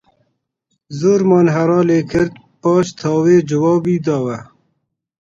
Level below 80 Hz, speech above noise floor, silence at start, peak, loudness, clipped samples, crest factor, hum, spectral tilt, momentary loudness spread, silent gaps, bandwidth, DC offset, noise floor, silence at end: -50 dBFS; 56 dB; 0.9 s; 0 dBFS; -15 LUFS; under 0.1%; 16 dB; none; -7.5 dB/octave; 9 LU; none; 7.8 kHz; under 0.1%; -70 dBFS; 0.8 s